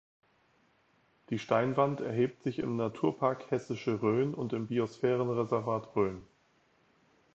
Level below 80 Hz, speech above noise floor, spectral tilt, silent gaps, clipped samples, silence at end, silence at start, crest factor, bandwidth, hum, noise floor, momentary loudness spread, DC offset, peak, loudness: -68 dBFS; 38 dB; -8 dB/octave; none; under 0.1%; 1.1 s; 1.3 s; 20 dB; 8 kHz; none; -70 dBFS; 6 LU; under 0.1%; -12 dBFS; -32 LUFS